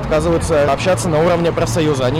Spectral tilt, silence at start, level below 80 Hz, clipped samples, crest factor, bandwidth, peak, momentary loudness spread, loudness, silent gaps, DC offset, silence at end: -5.5 dB/octave; 0 s; -32 dBFS; under 0.1%; 6 dB; 15.5 kHz; -8 dBFS; 2 LU; -15 LUFS; none; under 0.1%; 0 s